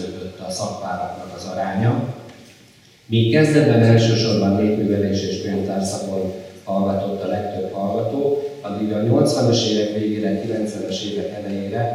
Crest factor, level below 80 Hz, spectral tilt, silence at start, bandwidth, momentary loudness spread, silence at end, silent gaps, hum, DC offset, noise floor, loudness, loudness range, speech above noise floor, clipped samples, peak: 18 dB; -62 dBFS; -6 dB/octave; 0 s; 12.5 kHz; 13 LU; 0 s; none; none; under 0.1%; -49 dBFS; -20 LUFS; 6 LU; 30 dB; under 0.1%; -2 dBFS